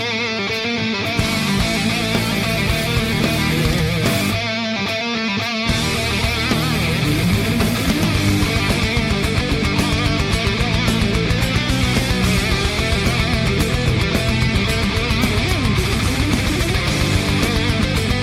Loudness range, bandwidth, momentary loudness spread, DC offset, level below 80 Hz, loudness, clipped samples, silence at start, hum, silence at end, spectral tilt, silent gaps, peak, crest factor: 1 LU; 16.5 kHz; 2 LU; under 0.1%; -26 dBFS; -18 LUFS; under 0.1%; 0 s; none; 0 s; -4.5 dB/octave; none; -4 dBFS; 14 dB